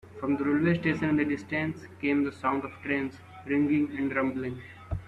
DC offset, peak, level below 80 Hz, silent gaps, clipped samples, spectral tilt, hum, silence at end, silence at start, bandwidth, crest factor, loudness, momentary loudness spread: under 0.1%; -12 dBFS; -54 dBFS; none; under 0.1%; -8 dB/octave; none; 0 s; 0.05 s; 8.2 kHz; 16 dB; -29 LUFS; 11 LU